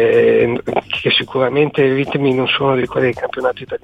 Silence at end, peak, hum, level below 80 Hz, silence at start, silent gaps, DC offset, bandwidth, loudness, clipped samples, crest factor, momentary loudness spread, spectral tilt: 0.05 s; -2 dBFS; none; -50 dBFS; 0 s; none; under 0.1%; 7.8 kHz; -15 LUFS; under 0.1%; 14 dB; 7 LU; -7 dB/octave